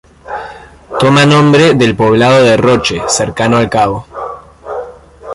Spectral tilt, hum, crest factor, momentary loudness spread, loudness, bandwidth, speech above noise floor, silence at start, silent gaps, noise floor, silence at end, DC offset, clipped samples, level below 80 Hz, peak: -5 dB/octave; none; 10 dB; 18 LU; -9 LUFS; 11.5 kHz; 22 dB; 0.25 s; none; -31 dBFS; 0 s; under 0.1%; under 0.1%; -38 dBFS; 0 dBFS